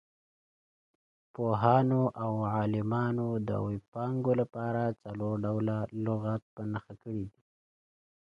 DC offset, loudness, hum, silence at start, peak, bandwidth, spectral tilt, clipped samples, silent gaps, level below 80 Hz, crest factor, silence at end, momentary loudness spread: under 0.1%; -32 LUFS; none; 1.4 s; -10 dBFS; 5.2 kHz; -10 dB/octave; under 0.1%; 3.88-3.92 s, 6.42-6.57 s; -62 dBFS; 22 dB; 1 s; 13 LU